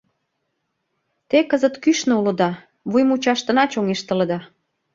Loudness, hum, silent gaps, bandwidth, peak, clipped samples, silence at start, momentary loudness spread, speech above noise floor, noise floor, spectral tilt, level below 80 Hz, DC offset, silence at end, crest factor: -19 LUFS; none; none; 7.6 kHz; -2 dBFS; under 0.1%; 1.3 s; 5 LU; 56 dB; -74 dBFS; -5 dB/octave; -64 dBFS; under 0.1%; 0.5 s; 18 dB